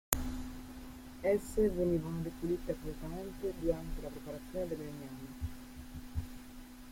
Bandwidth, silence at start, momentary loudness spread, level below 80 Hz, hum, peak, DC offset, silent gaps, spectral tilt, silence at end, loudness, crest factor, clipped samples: 16.5 kHz; 0.1 s; 16 LU; -48 dBFS; none; -4 dBFS; under 0.1%; none; -5.5 dB/octave; 0 s; -38 LUFS; 34 dB; under 0.1%